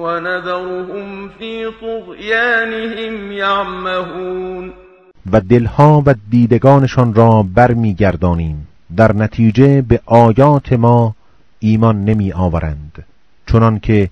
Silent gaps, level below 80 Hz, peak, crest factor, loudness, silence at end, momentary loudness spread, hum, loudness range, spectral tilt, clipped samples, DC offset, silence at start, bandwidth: none; -32 dBFS; 0 dBFS; 12 dB; -13 LUFS; 0 s; 15 LU; none; 7 LU; -8.5 dB/octave; 0.7%; under 0.1%; 0 s; 6.6 kHz